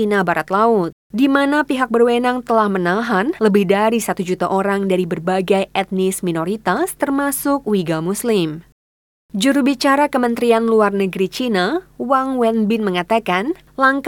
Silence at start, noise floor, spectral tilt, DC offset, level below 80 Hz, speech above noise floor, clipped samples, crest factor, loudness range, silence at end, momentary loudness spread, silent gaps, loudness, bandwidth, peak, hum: 0 s; under -90 dBFS; -5 dB/octave; under 0.1%; -54 dBFS; over 73 dB; under 0.1%; 16 dB; 3 LU; 0 s; 6 LU; 0.92-1.10 s, 8.72-9.29 s; -17 LUFS; 19 kHz; -2 dBFS; none